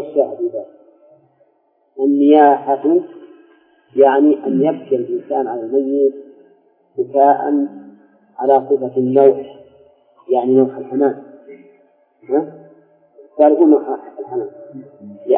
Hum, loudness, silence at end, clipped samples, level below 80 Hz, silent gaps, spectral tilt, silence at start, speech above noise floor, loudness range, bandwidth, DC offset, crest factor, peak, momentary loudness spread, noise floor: none; -15 LUFS; 0 s; under 0.1%; -72 dBFS; none; -11.5 dB/octave; 0 s; 46 dB; 5 LU; 3.6 kHz; under 0.1%; 16 dB; 0 dBFS; 19 LU; -60 dBFS